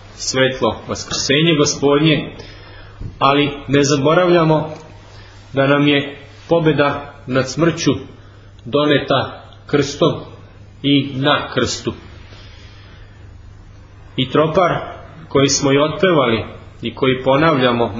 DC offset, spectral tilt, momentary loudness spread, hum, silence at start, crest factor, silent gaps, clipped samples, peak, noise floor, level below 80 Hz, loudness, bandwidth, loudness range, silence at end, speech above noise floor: under 0.1%; -4.5 dB/octave; 15 LU; none; 0.05 s; 18 dB; none; under 0.1%; 0 dBFS; -40 dBFS; -42 dBFS; -16 LUFS; 8 kHz; 5 LU; 0 s; 25 dB